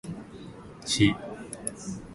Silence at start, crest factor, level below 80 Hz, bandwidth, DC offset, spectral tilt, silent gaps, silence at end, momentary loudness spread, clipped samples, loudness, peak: 0.05 s; 22 dB; -52 dBFS; 12 kHz; under 0.1%; -4 dB/octave; none; 0 s; 21 LU; under 0.1%; -28 LUFS; -8 dBFS